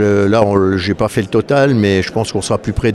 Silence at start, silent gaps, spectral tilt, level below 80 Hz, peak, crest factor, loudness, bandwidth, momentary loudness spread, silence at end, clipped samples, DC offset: 0 s; none; -6 dB/octave; -34 dBFS; 0 dBFS; 14 dB; -14 LUFS; 13 kHz; 6 LU; 0 s; under 0.1%; under 0.1%